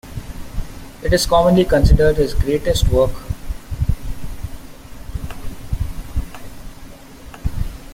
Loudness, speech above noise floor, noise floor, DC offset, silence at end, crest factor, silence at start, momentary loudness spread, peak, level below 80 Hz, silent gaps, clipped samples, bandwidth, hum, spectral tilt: -18 LUFS; 23 dB; -37 dBFS; under 0.1%; 0 s; 16 dB; 0.05 s; 25 LU; -2 dBFS; -24 dBFS; none; under 0.1%; 16.5 kHz; none; -6 dB/octave